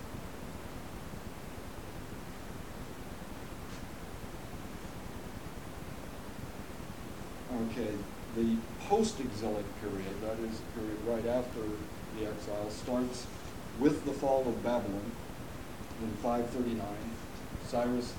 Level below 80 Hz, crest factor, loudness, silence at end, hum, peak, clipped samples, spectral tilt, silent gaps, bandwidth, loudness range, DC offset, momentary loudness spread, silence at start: -52 dBFS; 24 dB; -38 LUFS; 0 s; none; -14 dBFS; under 0.1%; -6 dB/octave; none; 19 kHz; 11 LU; 0.4%; 14 LU; 0 s